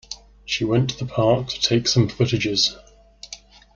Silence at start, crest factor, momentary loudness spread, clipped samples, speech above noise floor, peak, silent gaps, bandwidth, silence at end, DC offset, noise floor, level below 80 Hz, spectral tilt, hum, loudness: 0.1 s; 18 dB; 20 LU; under 0.1%; 23 dB; -4 dBFS; none; 7.6 kHz; 0.4 s; under 0.1%; -43 dBFS; -48 dBFS; -4.5 dB/octave; none; -20 LUFS